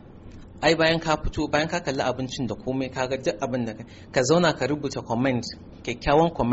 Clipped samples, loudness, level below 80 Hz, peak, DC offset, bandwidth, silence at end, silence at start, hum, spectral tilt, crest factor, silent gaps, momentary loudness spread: under 0.1%; -25 LUFS; -42 dBFS; -8 dBFS; under 0.1%; 8 kHz; 0 s; 0.05 s; none; -4 dB/octave; 18 dB; none; 9 LU